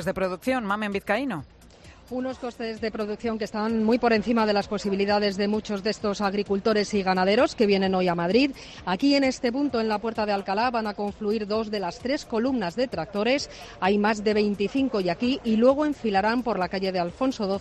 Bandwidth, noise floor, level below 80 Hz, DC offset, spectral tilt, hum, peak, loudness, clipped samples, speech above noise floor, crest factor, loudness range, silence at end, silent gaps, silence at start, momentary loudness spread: 13.5 kHz; -49 dBFS; -52 dBFS; under 0.1%; -5.5 dB/octave; none; -8 dBFS; -25 LUFS; under 0.1%; 24 dB; 18 dB; 4 LU; 0 s; none; 0 s; 8 LU